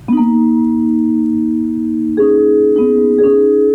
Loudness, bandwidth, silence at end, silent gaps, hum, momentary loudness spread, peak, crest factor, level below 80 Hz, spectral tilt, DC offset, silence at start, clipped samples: -12 LUFS; 3.2 kHz; 0 s; none; none; 6 LU; -4 dBFS; 8 dB; -48 dBFS; -9.5 dB/octave; under 0.1%; 0.05 s; under 0.1%